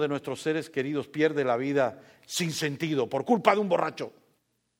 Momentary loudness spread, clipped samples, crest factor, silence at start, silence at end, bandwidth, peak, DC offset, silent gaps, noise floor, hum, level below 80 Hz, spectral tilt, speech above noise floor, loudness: 8 LU; under 0.1%; 24 dB; 0 s; 0.7 s; 17 kHz; -4 dBFS; under 0.1%; none; -73 dBFS; none; -76 dBFS; -5 dB/octave; 45 dB; -28 LUFS